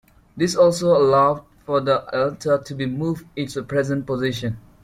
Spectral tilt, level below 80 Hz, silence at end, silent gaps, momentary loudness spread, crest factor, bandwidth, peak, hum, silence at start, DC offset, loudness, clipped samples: -6 dB/octave; -52 dBFS; 0.25 s; none; 12 LU; 16 dB; 15 kHz; -4 dBFS; none; 0.35 s; under 0.1%; -21 LUFS; under 0.1%